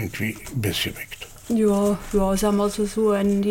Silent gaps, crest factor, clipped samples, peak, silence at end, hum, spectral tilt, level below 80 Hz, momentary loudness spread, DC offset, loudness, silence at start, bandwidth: none; 12 dB; under 0.1%; -10 dBFS; 0 s; none; -5.5 dB/octave; -40 dBFS; 8 LU; under 0.1%; -22 LUFS; 0 s; 17 kHz